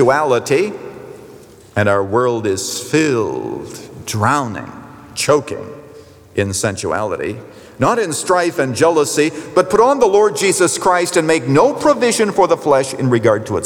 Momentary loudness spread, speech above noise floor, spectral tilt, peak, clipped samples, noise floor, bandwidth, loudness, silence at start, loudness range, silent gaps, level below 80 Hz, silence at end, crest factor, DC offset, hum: 16 LU; 25 dB; -4.5 dB/octave; -2 dBFS; under 0.1%; -40 dBFS; 19 kHz; -15 LUFS; 0 s; 6 LU; none; -54 dBFS; 0 s; 14 dB; under 0.1%; none